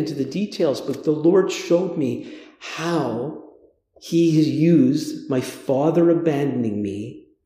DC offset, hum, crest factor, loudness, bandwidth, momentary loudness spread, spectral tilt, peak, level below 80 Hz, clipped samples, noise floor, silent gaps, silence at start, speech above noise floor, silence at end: under 0.1%; none; 14 dB; -20 LUFS; 15 kHz; 15 LU; -7 dB/octave; -6 dBFS; -66 dBFS; under 0.1%; -54 dBFS; none; 0 s; 34 dB; 0.25 s